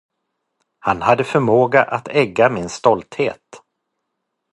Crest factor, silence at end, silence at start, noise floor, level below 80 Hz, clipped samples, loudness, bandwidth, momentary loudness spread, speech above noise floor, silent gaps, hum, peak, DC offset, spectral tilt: 18 dB; 0.95 s; 0.85 s; -76 dBFS; -54 dBFS; under 0.1%; -17 LUFS; 11.5 kHz; 9 LU; 59 dB; none; none; 0 dBFS; under 0.1%; -6 dB/octave